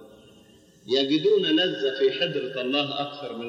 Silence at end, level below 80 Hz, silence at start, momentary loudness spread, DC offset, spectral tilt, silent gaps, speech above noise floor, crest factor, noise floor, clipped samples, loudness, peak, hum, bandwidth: 0 s; -74 dBFS; 0 s; 8 LU; under 0.1%; -5 dB/octave; none; 30 dB; 14 dB; -54 dBFS; under 0.1%; -24 LUFS; -10 dBFS; none; 7.6 kHz